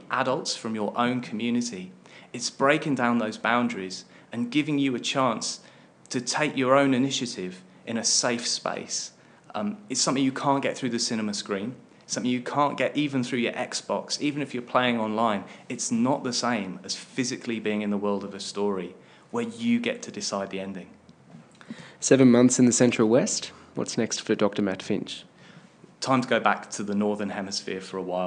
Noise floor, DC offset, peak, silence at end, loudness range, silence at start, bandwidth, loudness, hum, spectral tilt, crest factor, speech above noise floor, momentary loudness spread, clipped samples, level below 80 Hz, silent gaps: -52 dBFS; under 0.1%; -4 dBFS; 0 s; 7 LU; 0 s; 10.5 kHz; -26 LUFS; none; -4 dB/octave; 22 dB; 26 dB; 12 LU; under 0.1%; -80 dBFS; none